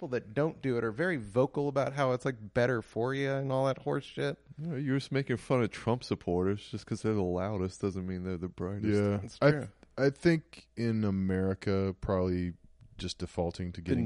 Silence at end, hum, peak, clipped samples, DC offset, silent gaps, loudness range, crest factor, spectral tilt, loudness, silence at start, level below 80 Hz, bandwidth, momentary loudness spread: 0 s; none; -12 dBFS; under 0.1%; under 0.1%; none; 3 LU; 20 dB; -7 dB/octave; -32 LUFS; 0 s; -56 dBFS; 11.5 kHz; 8 LU